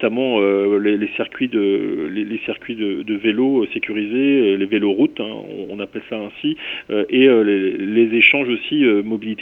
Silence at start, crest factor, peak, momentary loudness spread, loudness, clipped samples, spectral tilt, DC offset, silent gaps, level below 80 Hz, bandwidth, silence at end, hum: 0 s; 18 dB; 0 dBFS; 14 LU; -18 LUFS; under 0.1%; -7.5 dB/octave; under 0.1%; none; -62 dBFS; 3.9 kHz; 0 s; none